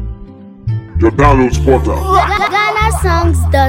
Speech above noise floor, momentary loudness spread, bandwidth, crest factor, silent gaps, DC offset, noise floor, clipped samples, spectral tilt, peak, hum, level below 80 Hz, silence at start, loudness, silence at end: 22 dB; 12 LU; 16.5 kHz; 12 dB; none; under 0.1%; -32 dBFS; 0.4%; -6 dB/octave; 0 dBFS; none; -18 dBFS; 0 s; -12 LUFS; 0 s